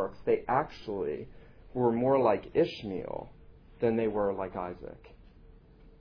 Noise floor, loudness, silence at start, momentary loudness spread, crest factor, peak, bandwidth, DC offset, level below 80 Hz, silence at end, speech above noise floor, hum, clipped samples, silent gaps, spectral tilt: -55 dBFS; -31 LUFS; 0 s; 16 LU; 18 dB; -12 dBFS; 5.4 kHz; under 0.1%; -56 dBFS; 0.1 s; 25 dB; none; under 0.1%; none; -8.5 dB/octave